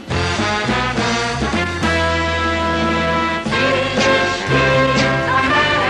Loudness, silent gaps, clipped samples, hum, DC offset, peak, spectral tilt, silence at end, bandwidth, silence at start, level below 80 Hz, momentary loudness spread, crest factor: -16 LUFS; none; under 0.1%; none; under 0.1%; -2 dBFS; -4.5 dB/octave; 0 s; 11.5 kHz; 0 s; -34 dBFS; 4 LU; 14 dB